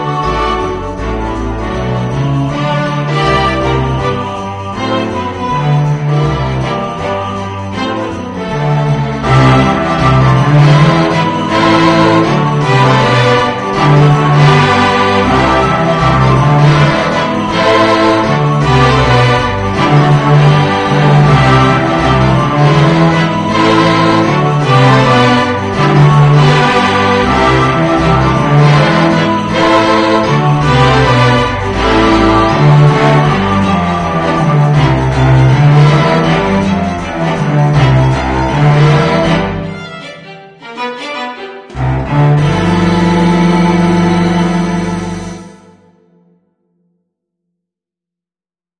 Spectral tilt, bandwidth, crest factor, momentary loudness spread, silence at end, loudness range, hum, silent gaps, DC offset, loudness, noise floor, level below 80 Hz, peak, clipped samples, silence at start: -6.5 dB/octave; 10 kHz; 10 dB; 10 LU; 3.3 s; 6 LU; none; none; under 0.1%; -10 LUFS; under -90 dBFS; -28 dBFS; 0 dBFS; 0.2%; 0 s